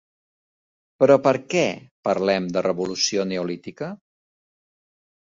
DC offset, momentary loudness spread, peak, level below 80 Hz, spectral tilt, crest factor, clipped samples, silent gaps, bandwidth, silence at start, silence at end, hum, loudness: under 0.1%; 14 LU; -2 dBFS; -64 dBFS; -4.5 dB/octave; 20 dB; under 0.1%; 1.91-2.03 s; 7.6 kHz; 1 s; 1.3 s; none; -22 LUFS